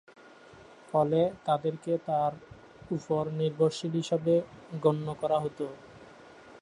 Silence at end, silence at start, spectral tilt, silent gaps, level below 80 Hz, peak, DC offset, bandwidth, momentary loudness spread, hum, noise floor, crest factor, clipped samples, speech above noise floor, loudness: 0 s; 0.5 s; -7 dB/octave; none; -68 dBFS; -12 dBFS; under 0.1%; 11 kHz; 10 LU; none; -53 dBFS; 18 dB; under 0.1%; 24 dB; -30 LUFS